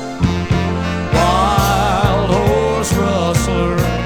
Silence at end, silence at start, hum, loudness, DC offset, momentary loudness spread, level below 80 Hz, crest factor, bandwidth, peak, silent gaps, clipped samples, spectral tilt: 0 s; 0 s; none; -15 LUFS; under 0.1%; 4 LU; -26 dBFS; 14 dB; over 20 kHz; -2 dBFS; none; under 0.1%; -5.5 dB/octave